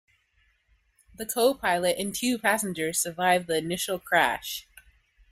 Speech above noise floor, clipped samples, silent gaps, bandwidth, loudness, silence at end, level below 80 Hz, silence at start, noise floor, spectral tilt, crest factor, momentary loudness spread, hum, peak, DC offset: 42 dB; under 0.1%; none; 16 kHz; -26 LUFS; 0.7 s; -62 dBFS; 1.2 s; -68 dBFS; -2.5 dB/octave; 20 dB; 9 LU; none; -8 dBFS; under 0.1%